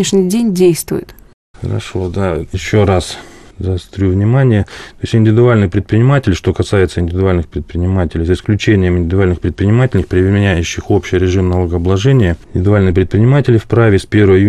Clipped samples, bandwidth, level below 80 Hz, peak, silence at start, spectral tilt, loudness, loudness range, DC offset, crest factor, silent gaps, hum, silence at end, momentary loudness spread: under 0.1%; 13.5 kHz; -34 dBFS; 0 dBFS; 0 s; -7 dB/octave; -13 LUFS; 3 LU; 0.4%; 12 dB; 1.33-1.54 s; none; 0 s; 9 LU